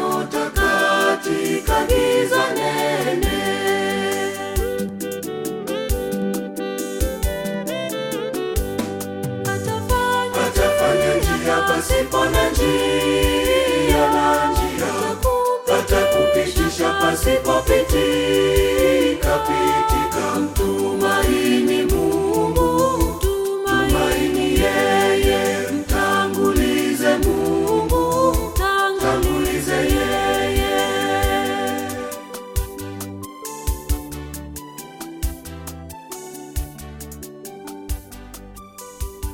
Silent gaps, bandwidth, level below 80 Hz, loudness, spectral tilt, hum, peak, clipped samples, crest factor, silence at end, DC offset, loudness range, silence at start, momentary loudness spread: none; 17 kHz; -28 dBFS; -19 LUFS; -4.5 dB/octave; none; -4 dBFS; under 0.1%; 16 dB; 0 s; under 0.1%; 12 LU; 0 s; 15 LU